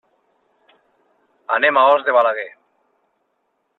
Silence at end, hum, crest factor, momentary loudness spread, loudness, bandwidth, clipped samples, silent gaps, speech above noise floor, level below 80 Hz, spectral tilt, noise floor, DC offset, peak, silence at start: 1.3 s; none; 18 dB; 19 LU; -16 LUFS; 4.2 kHz; under 0.1%; none; 54 dB; -74 dBFS; -5 dB/octave; -70 dBFS; under 0.1%; -2 dBFS; 1.5 s